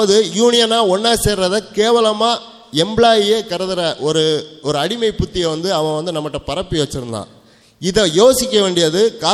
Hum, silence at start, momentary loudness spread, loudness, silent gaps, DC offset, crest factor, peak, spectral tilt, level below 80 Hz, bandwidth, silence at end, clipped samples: none; 0 s; 10 LU; -15 LUFS; none; under 0.1%; 16 dB; 0 dBFS; -4 dB/octave; -38 dBFS; 15.5 kHz; 0 s; under 0.1%